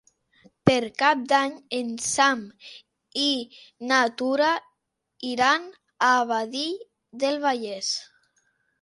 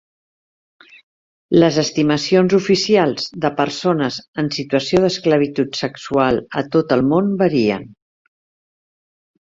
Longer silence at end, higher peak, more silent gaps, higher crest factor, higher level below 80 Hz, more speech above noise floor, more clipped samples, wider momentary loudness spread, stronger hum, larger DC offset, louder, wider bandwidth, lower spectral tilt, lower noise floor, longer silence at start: second, 0.75 s vs 1.6 s; about the same, -2 dBFS vs -2 dBFS; second, none vs 4.28-4.33 s; first, 24 dB vs 16 dB; second, -62 dBFS vs -52 dBFS; second, 54 dB vs over 73 dB; neither; first, 15 LU vs 7 LU; neither; neither; second, -24 LUFS vs -17 LUFS; first, 11.5 kHz vs 7.8 kHz; second, -3 dB/octave vs -5.5 dB/octave; second, -78 dBFS vs under -90 dBFS; second, 0.65 s vs 1.5 s